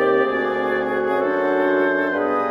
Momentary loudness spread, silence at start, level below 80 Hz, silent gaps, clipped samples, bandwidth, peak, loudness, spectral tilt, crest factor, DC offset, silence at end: 3 LU; 0 s; -58 dBFS; none; under 0.1%; 5.8 kHz; -6 dBFS; -20 LUFS; -6.5 dB/octave; 12 dB; under 0.1%; 0 s